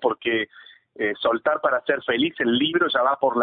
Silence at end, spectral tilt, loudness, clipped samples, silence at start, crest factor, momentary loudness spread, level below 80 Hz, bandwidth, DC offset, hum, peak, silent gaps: 0 s; -9 dB/octave; -22 LUFS; under 0.1%; 0 s; 16 dB; 6 LU; -64 dBFS; 4.7 kHz; under 0.1%; none; -6 dBFS; none